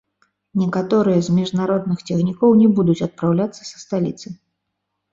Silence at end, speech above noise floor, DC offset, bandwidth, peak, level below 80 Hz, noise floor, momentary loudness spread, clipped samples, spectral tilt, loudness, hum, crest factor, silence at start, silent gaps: 0.8 s; 59 dB; under 0.1%; 7.8 kHz; -4 dBFS; -58 dBFS; -76 dBFS; 12 LU; under 0.1%; -7.5 dB/octave; -18 LUFS; none; 16 dB; 0.55 s; none